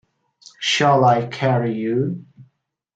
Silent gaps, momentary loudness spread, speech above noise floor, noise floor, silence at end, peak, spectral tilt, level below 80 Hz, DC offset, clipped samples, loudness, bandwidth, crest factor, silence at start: none; 11 LU; 47 dB; -65 dBFS; 0.55 s; -4 dBFS; -5.5 dB/octave; -62 dBFS; under 0.1%; under 0.1%; -19 LUFS; 9 kHz; 18 dB; 0.6 s